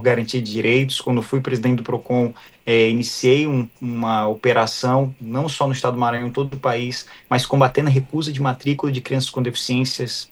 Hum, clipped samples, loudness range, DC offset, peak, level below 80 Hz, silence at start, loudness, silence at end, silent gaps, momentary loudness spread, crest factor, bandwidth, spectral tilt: none; under 0.1%; 2 LU; under 0.1%; -2 dBFS; -56 dBFS; 0 s; -20 LUFS; 0.05 s; none; 8 LU; 18 dB; 12.5 kHz; -5.5 dB/octave